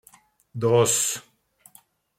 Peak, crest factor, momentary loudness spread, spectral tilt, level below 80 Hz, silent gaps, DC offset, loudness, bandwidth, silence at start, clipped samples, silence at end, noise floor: -6 dBFS; 20 dB; 16 LU; -3.5 dB/octave; -66 dBFS; none; under 0.1%; -22 LUFS; 16.5 kHz; 0.55 s; under 0.1%; 1 s; -57 dBFS